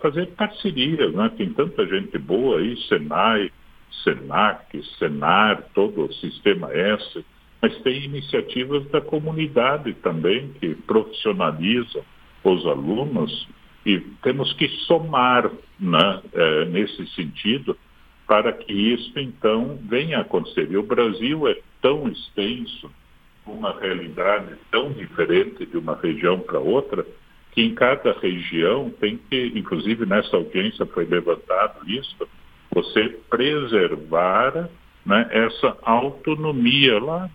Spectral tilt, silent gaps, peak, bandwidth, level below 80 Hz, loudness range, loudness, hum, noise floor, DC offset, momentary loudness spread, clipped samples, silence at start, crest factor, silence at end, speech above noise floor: -7.5 dB/octave; none; 0 dBFS; 5 kHz; -54 dBFS; 3 LU; -21 LUFS; none; -49 dBFS; under 0.1%; 10 LU; under 0.1%; 0 s; 22 dB; 0.05 s; 28 dB